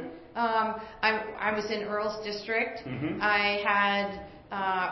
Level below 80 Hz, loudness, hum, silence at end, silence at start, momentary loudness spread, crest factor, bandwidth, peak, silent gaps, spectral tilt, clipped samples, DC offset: -60 dBFS; -29 LUFS; none; 0 s; 0 s; 10 LU; 20 dB; 6.2 kHz; -10 dBFS; none; -5 dB/octave; under 0.1%; under 0.1%